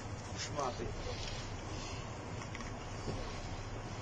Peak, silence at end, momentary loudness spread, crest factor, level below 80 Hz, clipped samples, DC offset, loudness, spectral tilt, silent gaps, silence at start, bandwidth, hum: -24 dBFS; 0 s; 5 LU; 18 dB; -48 dBFS; under 0.1%; under 0.1%; -42 LUFS; -4.5 dB/octave; none; 0 s; 9.6 kHz; none